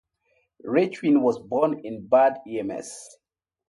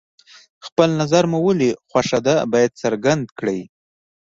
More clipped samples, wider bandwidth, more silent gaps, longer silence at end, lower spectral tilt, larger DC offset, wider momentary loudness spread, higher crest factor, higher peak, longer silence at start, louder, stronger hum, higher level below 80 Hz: neither; first, 11.5 kHz vs 7.8 kHz; second, none vs 0.72-0.76 s, 3.32-3.36 s; about the same, 0.6 s vs 0.65 s; about the same, -6 dB/octave vs -5.5 dB/octave; neither; first, 17 LU vs 8 LU; about the same, 18 dB vs 18 dB; second, -8 dBFS vs -2 dBFS; about the same, 0.65 s vs 0.65 s; second, -23 LUFS vs -19 LUFS; neither; second, -68 dBFS vs -56 dBFS